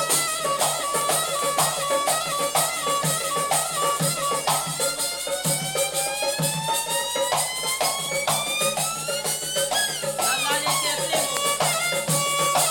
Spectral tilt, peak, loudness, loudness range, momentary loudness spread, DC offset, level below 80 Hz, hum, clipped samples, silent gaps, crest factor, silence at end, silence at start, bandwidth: -1.5 dB/octave; -4 dBFS; -22 LUFS; 1 LU; 3 LU; under 0.1%; -60 dBFS; none; under 0.1%; none; 20 dB; 0 s; 0 s; 17 kHz